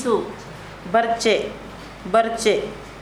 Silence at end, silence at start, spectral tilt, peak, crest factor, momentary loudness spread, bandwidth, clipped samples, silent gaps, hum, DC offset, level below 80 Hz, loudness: 0 s; 0 s; -3.5 dB/octave; -4 dBFS; 18 dB; 17 LU; 13.5 kHz; under 0.1%; none; none; under 0.1%; -48 dBFS; -21 LUFS